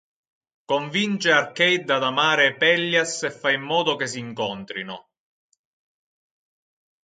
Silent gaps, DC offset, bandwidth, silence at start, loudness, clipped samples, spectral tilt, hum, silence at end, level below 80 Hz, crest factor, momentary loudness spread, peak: none; under 0.1%; 9.4 kHz; 0.7 s; -21 LUFS; under 0.1%; -3 dB/octave; none; 2.05 s; -72 dBFS; 20 dB; 13 LU; -4 dBFS